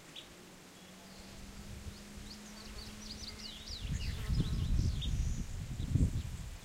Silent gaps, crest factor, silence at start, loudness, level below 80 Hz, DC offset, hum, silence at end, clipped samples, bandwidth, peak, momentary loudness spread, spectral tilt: none; 20 dB; 0 s; -40 LUFS; -42 dBFS; under 0.1%; none; 0 s; under 0.1%; 16 kHz; -18 dBFS; 17 LU; -5.5 dB/octave